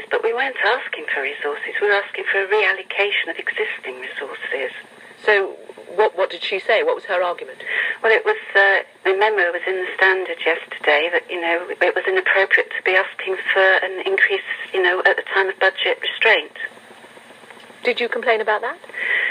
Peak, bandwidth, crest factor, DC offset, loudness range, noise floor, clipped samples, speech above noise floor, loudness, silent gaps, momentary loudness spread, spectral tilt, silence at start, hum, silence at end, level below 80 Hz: -2 dBFS; 11 kHz; 18 dB; under 0.1%; 4 LU; -43 dBFS; under 0.1%; 24 dB; -19 LUFS; none; 10 LU; -2.5 dB/octave; 0 s; none; 0 s; -78 dBFS